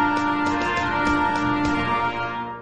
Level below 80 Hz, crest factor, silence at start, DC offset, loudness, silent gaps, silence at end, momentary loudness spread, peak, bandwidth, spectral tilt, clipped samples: -42 dBFS; 12 dB; 0 s; 0.6%; -22 LUFS; none; 0 s; 4 LU; -10 dBFS; 9.4 kHz; -5.5 dB/octave; under 0.1%